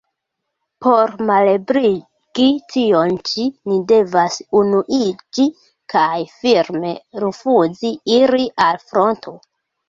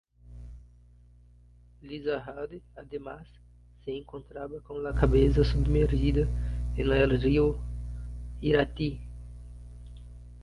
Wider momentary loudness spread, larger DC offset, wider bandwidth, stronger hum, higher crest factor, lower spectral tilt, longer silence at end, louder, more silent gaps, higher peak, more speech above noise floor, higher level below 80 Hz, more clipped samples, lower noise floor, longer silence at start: second, 8 LU vs 23 LU; neither; second, 7.6 kHz vs 10.5 kHz; second, none vs 60 Hz at -35 dBFS; about the same, 16 dB vs 20 dB; second, -5 dB/octave vs -8.5 dB/octave; first, 0.5 s vs 0 s; first, -16 LUFS vs -28 LUFS; neither; first, -2 dBFS vs -10 dBFS; first, 61 dB vs 29 dB; second, -58 dBFS vs -34 dBFS; neither; first, -77 dBFS vs -56 dBFS; first, 0.8 s vs 0.25 s